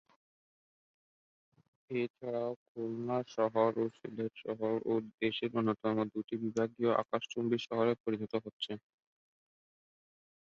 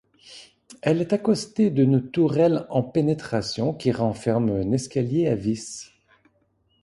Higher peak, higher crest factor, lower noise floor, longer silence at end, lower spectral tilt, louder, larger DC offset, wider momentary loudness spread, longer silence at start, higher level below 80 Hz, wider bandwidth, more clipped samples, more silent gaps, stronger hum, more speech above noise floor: second, -16 dBFS vs -6 dBFS; about the same, 20 dB vs 18 dB; first, under -90 dBFS vs -67 dBFS; first, 1.75 s vs 1 s; second, -5 dB/octave vs -7 dB/octave; second, -35 LUFS vs -23 LUFS; neither; about the same, 9 LU vs 8 LU; first, 1.9 s vs 0.25 s; second, -78 dBFS vs -54 dBFS; second, 7.4 kHz vs 11.5 kHz; neither; first, 2.10-2.14 s, 2.56-2.75 s, 5.14-5.18 s, 8.00-8.04 s, 8.53-8.60 s vs none; neither; first, over 55 dB vs 44 dB